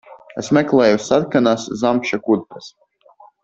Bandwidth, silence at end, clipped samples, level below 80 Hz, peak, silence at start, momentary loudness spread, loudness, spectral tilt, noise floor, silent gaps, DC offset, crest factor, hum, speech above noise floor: 8 kHz; 0.75 s; under 0.1%; -58 dBFS; -2 dBFS; 0.1 s; 17 LU; -17 LUFS; -5.5 dB/octave; -49 dBFS; none; under 0.1%; 16 dB; none; 32 dB